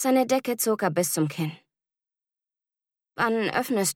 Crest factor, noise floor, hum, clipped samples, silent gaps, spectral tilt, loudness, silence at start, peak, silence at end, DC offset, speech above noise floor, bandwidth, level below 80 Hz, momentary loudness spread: 18 dB; under -90 dBFS; none; under 0.1%; none; -4 dB/octave; -25 LUFS; 0 s; -10 dBFS; 0.05 s; under 0.1%; over 65 dB; 18 kHz; -72 dBFS; 9 LU